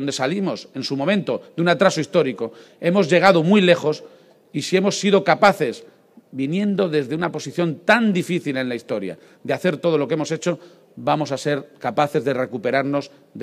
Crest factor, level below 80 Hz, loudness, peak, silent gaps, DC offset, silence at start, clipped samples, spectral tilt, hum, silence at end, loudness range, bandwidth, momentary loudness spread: 20 dB; -68 dBFS; -20 LUFS; 0 dBFS; none; under 0.1%; 0 s; under 0.1%; -5.5 dB/octave; none; 0 s; 6 LU; 14.5 kHz; 13 LU